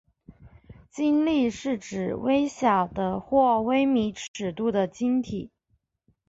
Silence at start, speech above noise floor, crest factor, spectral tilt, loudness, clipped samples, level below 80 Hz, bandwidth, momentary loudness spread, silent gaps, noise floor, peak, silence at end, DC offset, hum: 0.3 s; 48 dB; 18 dB; -6 dB/octave; -25 LUFS; under 0.1%; -56 dBFS; 8 kHz; 11 LU; 4.28-4.34 s; -72 dBFS; -8 dBFS; 0.8 s; under 0.1%; none